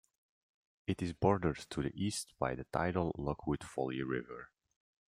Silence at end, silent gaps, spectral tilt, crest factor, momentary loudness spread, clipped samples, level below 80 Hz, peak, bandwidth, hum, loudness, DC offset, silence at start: 0.65 s; none; -6 dB/octave; 24 dB; 9 LU; under 0.1%; -58 dBFS; -14 dBFS; 15.5 kHz; none; -37 LUFS; under 0.1%; 0.9 s